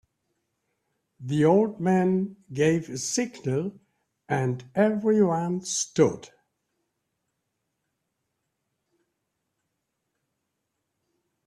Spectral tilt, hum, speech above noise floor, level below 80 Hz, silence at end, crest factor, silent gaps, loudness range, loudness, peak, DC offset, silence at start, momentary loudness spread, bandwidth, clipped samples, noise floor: -5.5 dB/octave; none; 56 dB; -68 dBFS; 5.2 s; 20 dB; none; 5 LU; -25 LUFS; -8 dBFS; under 0.1%; 1.2 s; 9 LU; 13 kHz; under 0.1%; -80 dBFS